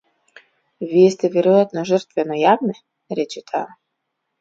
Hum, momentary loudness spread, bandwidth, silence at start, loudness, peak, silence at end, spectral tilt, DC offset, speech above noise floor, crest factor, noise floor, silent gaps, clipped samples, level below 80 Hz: none; 14 LU; 7.8 kHz; 0.8 s; -18 LUFS; -2 dBFS; 0.75 s; -6.5 dB/octave; under 0.1%; 58 dB; 18 dB; -76 dBFS; none; under 0.1%; -72 dBFS